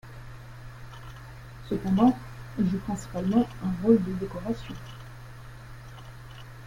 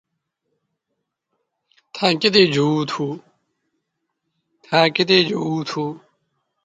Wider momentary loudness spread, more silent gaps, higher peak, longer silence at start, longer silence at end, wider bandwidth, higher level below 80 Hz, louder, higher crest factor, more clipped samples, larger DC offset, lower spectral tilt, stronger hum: first, 22 LU vs 14 LU; neither; second, -8 dBFS vs 0 dBFS; second, 0.05 s vs 1.95 s; second, 0 s vs 0.65 s; first, 16 kHz vs 9.2 kHz; first, -48 dBFS vs -64 dBFS; second, -27 LUFS vs -18 LUFS; about the same, 20 dB vs 22 dB; neither; neither; first, -7.5 dB/octave vs -5 dB/octave; neither